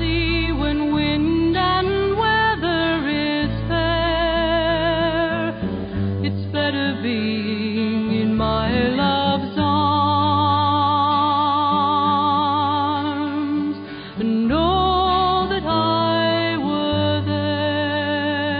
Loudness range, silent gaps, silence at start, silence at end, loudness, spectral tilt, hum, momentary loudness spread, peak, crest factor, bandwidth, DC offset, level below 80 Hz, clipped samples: 3 LU; none; 0 s; 0 s; -20 LUFS; -11 dB/octave; none; 5 LU; -6 dBFS; 14 dB; 5.2 kHz; under 0.1%; -36 dBFS; under 0.1%